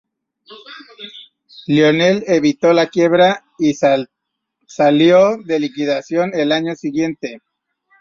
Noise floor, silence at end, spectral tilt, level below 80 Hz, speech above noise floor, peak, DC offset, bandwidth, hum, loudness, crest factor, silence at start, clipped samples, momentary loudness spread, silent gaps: -75 dBFS; 0.65 s; -5.5 dB/octave; -60 dBFS; 60 dB; -2 dBFS; under 0.1%; 7.4 kHz; none; -15 LUFS; 14 dB; 0.5 s; under 0.1%; 21 LU; none